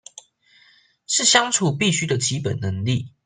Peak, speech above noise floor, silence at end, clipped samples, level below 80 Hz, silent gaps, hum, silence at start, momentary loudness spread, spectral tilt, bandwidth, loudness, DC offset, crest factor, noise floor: -2 dBFS; 36 dB; 0.15 s; under 0.1%; -60 dBFS; none; none; 1.1 s; 10 LU; -3 dB/octave; 10 kHz; -20 LUFS; under 0.1%; 20 dB; -56 dBFS